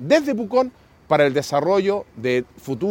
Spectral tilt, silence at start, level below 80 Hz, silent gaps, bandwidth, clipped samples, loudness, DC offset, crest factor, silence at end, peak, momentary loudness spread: -5.5 dB/octave; 0 s; -58 dBFS; none; 17 kHz; under 0.1%; -21 LUFS; under 0.1%; 18 dB; 0 s; -2 dBFS; 8 LU